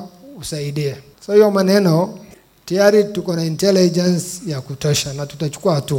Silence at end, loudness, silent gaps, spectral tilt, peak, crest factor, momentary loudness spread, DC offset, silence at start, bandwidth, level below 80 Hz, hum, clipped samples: 0 s; -17 LUFS; none; -5.5 dB/octave; 0 dBFS; 16 dB; 13 LU; under 0.1%; 0 s; 17 kHz; -52 dBFS; none; under 0.1%